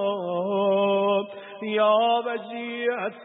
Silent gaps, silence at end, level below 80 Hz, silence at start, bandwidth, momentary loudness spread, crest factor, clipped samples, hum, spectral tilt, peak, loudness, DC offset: none; 0 s; -80 dBFS; 0 s; 4 kHz; 11 LU; 16 dB; under 0.1%; none; -9.5 dB/octave; -10 dBFS; -24 LUFS; under 0.1%